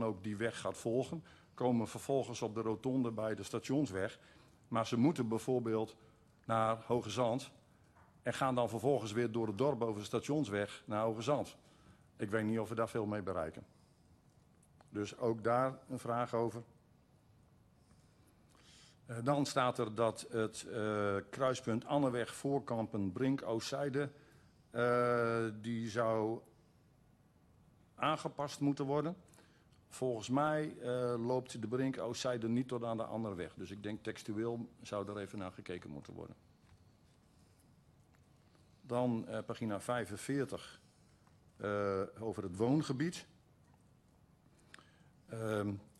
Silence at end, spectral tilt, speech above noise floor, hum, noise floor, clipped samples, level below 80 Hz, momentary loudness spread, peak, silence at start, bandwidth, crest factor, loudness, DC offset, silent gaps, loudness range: 0.15 s; -6 dB/octave; 31 dB; none; -68 dBFS; under 0.1%; -72 dBFS; 11 LU; -20 dBFS; 0 s; 13 kHz; 18 dB; -38 LUFS; under 0.1%; none; 7 LU